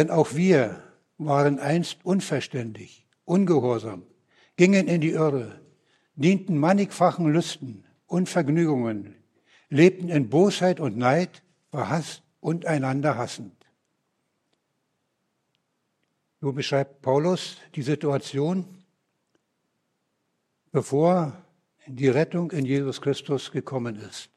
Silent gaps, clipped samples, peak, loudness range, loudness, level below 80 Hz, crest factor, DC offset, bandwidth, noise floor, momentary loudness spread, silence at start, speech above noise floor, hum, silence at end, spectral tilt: none; under 0.1%; -2 dBFS; 8 LU; -24 LUFS; -72 dBFS; 22 dB; under 0.1%; 12.5 kHz; -76 dBFS; 14 LU; 0 s; 52 dB; none; 0.1 s; -6.5 dB/octave